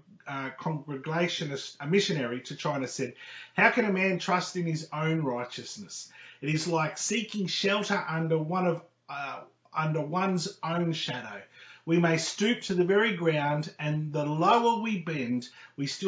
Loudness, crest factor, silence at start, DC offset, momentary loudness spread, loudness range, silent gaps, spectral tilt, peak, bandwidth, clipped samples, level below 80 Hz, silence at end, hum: -29 LUFS; 20 dB; 0.25 s; under 0.1%; 14 LU; 4 LU; none; -5 dB/octave; -8 dBFS; 8 kHz; under 0.1%; -74 dBFS; 0 s; none